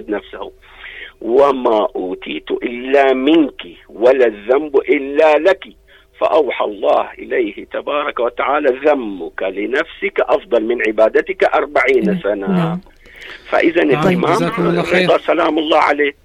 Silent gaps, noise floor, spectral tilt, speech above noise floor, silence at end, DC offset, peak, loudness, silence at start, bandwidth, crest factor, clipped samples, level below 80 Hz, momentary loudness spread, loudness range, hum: none; -34 dBFS; -6.5 dB/octave; 19 dB; 0.15 s; under 0.1%; -2 dBFS; -15 LUFS; 0 s; 12 kHz; 14 dB; under 0.1%; -48 dBFS; 13 LU; 3 LU; none